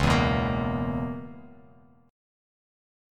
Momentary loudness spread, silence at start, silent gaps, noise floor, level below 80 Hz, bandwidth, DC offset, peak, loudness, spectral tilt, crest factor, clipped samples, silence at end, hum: 20 LU; 0 s; none; -56 dBFS; -40 dBFS; 14 kHz; under 0.1%; -8 dBFS; -27 LUFS; -6.5 dB/octave; 20 dB; under 0.1%; 1 s; none